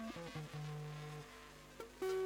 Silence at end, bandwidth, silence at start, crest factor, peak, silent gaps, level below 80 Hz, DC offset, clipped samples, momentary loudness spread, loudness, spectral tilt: 0 s; 20 kHz; 0 s; 14 dB; -32 dBFS; none; -66 dBFS; under 0.1%; under 0.1%; 10 LU; -49 LUFS; -6 dB/octave